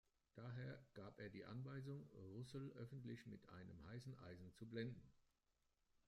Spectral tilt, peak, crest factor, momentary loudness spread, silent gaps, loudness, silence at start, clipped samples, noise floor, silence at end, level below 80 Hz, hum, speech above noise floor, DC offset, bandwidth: -7.5 dB/octave; -38 dBFS; 18 dB; 8 LU; none; -57 LUFS; 0.35 s; under 0.1%; -87 dBFS; 0.9 s; -80 dBFS; none; 32 dB; under 0.1%; 12 kHz